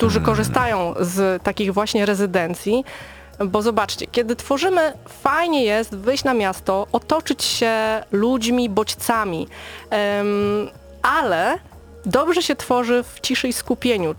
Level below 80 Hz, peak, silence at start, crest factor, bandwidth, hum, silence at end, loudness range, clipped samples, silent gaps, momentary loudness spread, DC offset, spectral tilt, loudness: -46 dBFS; 0 dBFS; 0 s; 20 dB; over 20 kHz; none; 0 s; 1 LU; under 0.1%; none; 6 LU; under 0.1%; -4.5 dB/octave; -20 LUFS